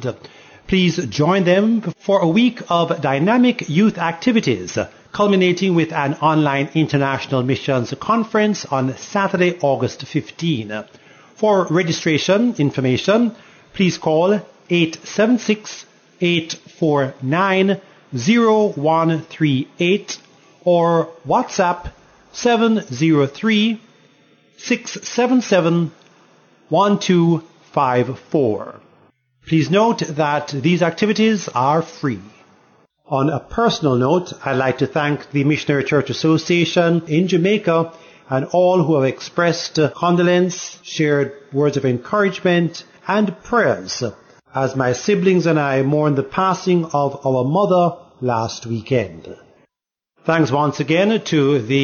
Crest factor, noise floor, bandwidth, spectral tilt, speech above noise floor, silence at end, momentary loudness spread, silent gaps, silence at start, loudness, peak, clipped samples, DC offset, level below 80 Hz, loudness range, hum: 14 dB; -84 dBFS; 7 kHz; -6 dB/octave; 67 dB; 0 s; 9 LU; none; 0 s; -18 LUFS; -4 dBFS; under 0.1%; under 0.1%; -54 dBFS; 3 LU; none